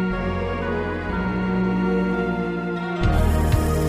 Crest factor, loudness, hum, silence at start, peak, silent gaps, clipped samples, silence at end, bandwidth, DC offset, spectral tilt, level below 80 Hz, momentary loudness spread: 14 dB; -23 LUFS; none; 0 s; -8 dBFS; none; under 0.1%; 0 s; 15.5 kHz; under 0.1%; -7.5 dB/octave; -28 dBFS; 5 LU